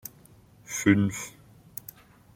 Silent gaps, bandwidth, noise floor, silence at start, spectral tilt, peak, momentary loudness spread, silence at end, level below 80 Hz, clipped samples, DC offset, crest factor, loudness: none; 16.5 kHz; -55 dBFS; 0.05 s; -5 dB/octave; -8 dBFS; 21 LU; 1.05 s; -62 dBFS; under 0.1%; under 0.1%; 22 dB; -26 LUFS